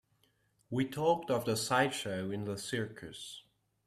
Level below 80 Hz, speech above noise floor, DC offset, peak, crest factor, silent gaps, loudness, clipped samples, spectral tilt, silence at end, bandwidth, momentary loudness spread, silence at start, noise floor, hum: -70 dBFS; 39 dB; under 0.1%; -14 dBFS; 22 dB; none; -34 LUFS; under 0.1%; -4.5 dB/octave; 0.45 s; 15 kHz; 15 LU; 0.7 s; -73 dBFS; none